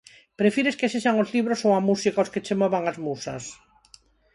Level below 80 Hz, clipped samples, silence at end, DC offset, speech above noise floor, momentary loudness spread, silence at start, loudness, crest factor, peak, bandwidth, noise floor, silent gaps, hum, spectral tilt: -66 dBFS; under 0.1%; 0.8 s; under 0.1%; 32 dB; 10 LU; 0.4 s; -24 LUFS; 18 dB; -8 dBFS; 11.5 kHz; -56 dBFS; none; none; -5 dB/octave